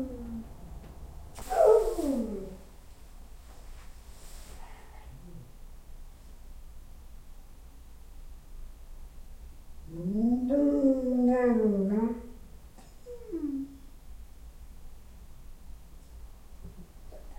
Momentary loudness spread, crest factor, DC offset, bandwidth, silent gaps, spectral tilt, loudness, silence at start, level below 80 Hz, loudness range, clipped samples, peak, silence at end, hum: 28 LU; 22 dB; under 0.1%; 16.5 kHz; none; -7.5 dB/octave; -28 LUFS; 0 s; -46 dBFS; 25 LU; under 0.1%; -10 dBFS; 0 s; none